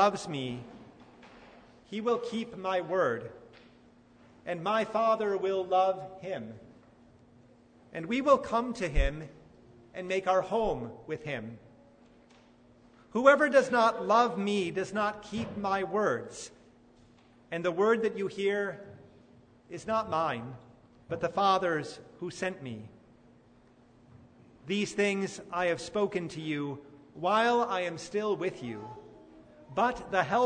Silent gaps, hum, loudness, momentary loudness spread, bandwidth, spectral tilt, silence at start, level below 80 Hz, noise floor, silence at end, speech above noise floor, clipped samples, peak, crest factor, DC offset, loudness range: none; none; -30 LUFS; 18 LU; 9.6 kHz; -5 dB/octave; 0 s; -48 dBFS; -60 dBFS; 0 s; 30 dB; under 0.1%; -8 dBFS; 24 dB; under 0.1%; 7 LU